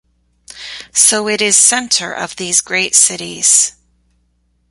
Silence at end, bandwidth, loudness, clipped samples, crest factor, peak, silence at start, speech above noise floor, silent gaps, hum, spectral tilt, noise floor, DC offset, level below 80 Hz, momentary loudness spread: 1 s; 16 kHz; -11 LUFS; 0.1%; 16 dB; 0 dBFS; 0.55 s; 47 dB; none; 60 Hz at -50 dBFS; 0 dB/octave; -60 dBFS; under 0.1%; -56 dBFS; 14 LU